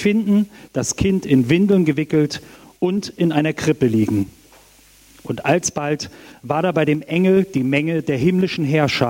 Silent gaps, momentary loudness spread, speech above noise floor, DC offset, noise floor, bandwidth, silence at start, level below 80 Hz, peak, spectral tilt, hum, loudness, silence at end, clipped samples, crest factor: none; 8 LU; 32 dB; under 0.1%; -50 dBFS; 16.5 kHz; 0 s; -46 dBFS; -2 dBFS; -6 dB/octave; none; -18 LUFS; 0 s; under 0.1%; 16 dB